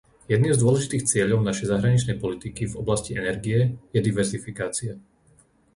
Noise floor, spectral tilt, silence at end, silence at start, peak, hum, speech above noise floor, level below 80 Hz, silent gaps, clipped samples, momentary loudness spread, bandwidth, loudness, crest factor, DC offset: -59 dBFS; -5.5 dB/octave; 0.75 s; 0.3 s; -8 dBFS; none; 36 dB; -48 dBFS; none; under 0.1%; 10 LU; 11.5 kHz; -24 LUFS; 16 dB; under 0.1%